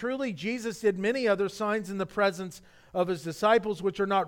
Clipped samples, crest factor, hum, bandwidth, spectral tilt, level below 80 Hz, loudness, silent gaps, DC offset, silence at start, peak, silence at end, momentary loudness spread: under 0.1%; 18 dB; none; 17 kHz; -5 dB/octave; -64 dBFS; -28 LUFS; none; under 0.1%; 0 s; -10 dBFS; 0 s; 8 LU